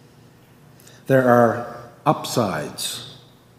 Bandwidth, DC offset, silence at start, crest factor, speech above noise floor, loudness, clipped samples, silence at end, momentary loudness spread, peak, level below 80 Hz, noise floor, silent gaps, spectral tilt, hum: 16 kHz; under 0.1%; 1.1 s; 22 dB; 31 dB; -20 LUFS; under 0.1%; 0.45 s; 19 LU; 0 dBFS; -62 dBFS; -50 dBFS; none; -5 dB/octave; none